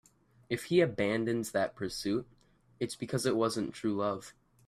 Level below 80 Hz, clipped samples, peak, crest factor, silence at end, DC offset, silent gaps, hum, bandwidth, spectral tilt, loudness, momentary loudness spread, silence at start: -66 dBFS; under 0.1%; -14 dBFS; 20 dB; 0.35 s; under 0.1%; none; none; 15 kHz; -5 dB/octave; -33 LUFS; 10 LU; 0.5 s